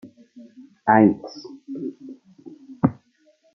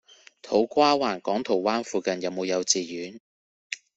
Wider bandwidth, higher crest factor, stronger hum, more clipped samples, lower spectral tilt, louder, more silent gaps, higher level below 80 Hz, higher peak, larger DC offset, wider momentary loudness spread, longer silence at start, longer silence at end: second, 6.2 kHz vs 8.2 kHz; about the same, 22 dB vs 20 dB; neither; neither; first, -8.5 dB/octave vs -3 dB/octave; first, -21 LUFS vs -25 LUFS; second, none vs 3.20-3.70 s; first, -60 dBFS vs -68 dBFS; first, -2 dBFS vs -6 dBFS; neither; first, 27 LU vs 15 LU; second, 0.05 s vs 0.45 s; first, 0.6 s vs 0.2 s